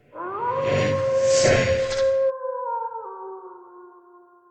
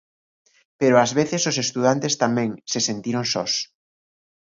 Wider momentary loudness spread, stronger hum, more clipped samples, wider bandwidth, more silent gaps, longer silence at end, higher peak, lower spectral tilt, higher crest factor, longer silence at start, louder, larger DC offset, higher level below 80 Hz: first, 19 LU vs 7 LU; neither; neither; first, 9.2 kHz vs 7.6 kHz; neither; second, 0.6 s vs 0.95 s; second, -6 dBFS vs -2 dBFS; about the same, -4 dB/octave vs -3.5 dB/octave; about the same, 18 dB vs 20 dB; second, 0.15 s vs 0.8 s; about the same, -22 LUFS vs -21 LUFS; neither; first, -48 dBFS vs -66 dBFS